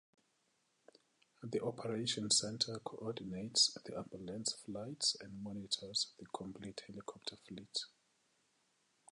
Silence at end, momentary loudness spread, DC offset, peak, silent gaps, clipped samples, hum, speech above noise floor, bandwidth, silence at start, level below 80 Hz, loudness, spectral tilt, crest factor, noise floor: 1.25 s; 16 LU; under 0.1%; -18 dBFS; none; under 0.1%; none; 38 dB; 11 kHz; 1.4 s; -76 dBFS; -39 LUFS; -2.5 dB/octave; 24 dB; -79 dBFS